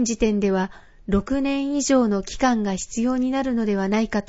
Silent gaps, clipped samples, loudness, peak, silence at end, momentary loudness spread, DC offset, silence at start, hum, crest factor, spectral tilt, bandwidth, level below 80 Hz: none; under 0.1%; -22 LUFS; -6 dBFS; 0.05 s; 5 LU; under 0.1%; 0 s; none; 16 dB; -5 dB/octave; 8 kHz; -40 dBFS